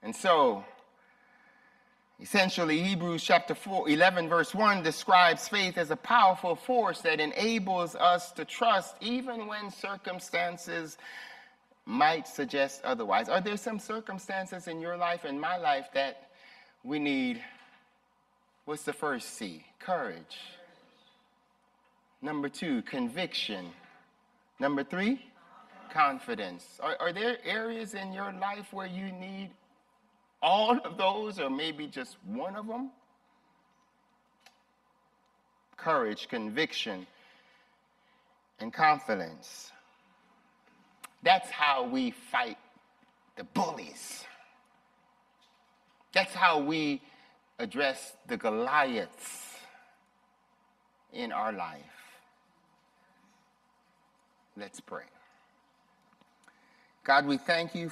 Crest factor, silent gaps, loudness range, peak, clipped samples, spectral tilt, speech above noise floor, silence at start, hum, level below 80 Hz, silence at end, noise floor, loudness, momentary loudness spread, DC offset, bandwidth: 26 dB; none; 15 LU; -8 dBFS; under 0.1%; -4 dB/octave; 40 dB; 0.05 s; none; -78 dBFS; 0 s; -71 dBFS; -30 LUFS; 18 LU; under 0.1%; 15 kHz